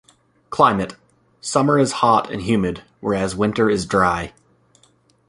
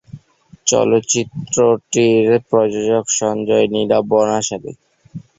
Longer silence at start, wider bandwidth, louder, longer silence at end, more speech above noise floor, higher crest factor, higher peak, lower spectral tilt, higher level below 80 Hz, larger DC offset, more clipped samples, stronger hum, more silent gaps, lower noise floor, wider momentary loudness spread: first, 0.5 s vs 0.15 s; first, 11.5 kHz vs 8 kHz; second, -19 LUFS vs -16 LUFS; first, 1 s vs 0.2 s; first, 39 dB vs 31 dB; about the same, 18 dB vs 14 dB; about the same, -2 dBFS vs -2 dBFS; first, -5.5 dB/octave vs -4 dB/octave; first, -46 dBFS vs -56 dBFS; neither; neither; neither; neither; first, -58 dBFS vs -46 dBFS; first, 12 LU vs 7 LU